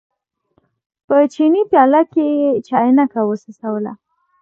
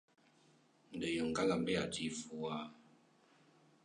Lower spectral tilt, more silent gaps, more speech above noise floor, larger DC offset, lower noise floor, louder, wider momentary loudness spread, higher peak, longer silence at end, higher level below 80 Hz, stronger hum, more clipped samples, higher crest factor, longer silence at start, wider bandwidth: first, -7.5 dB/octave vs -4.5 dB/octave; neither; first, 49 dB vs 31 dB; neither; second, -64 dBFS vs -70 dBFS; first, -15 LUFS vs -39 LUFS; about the same, 12 LU vs 11 LU; first, 0 dBFS vs -22 dBFS; second, 0.45 s vs 1.1 s; about the same, -66 dBFS vs -70 dBFS; neither; neither; about the same, 16 dB vs 20 dB; first, 1.1 s vs 0.9 s; second, 7.4 kHz vs 11 kHz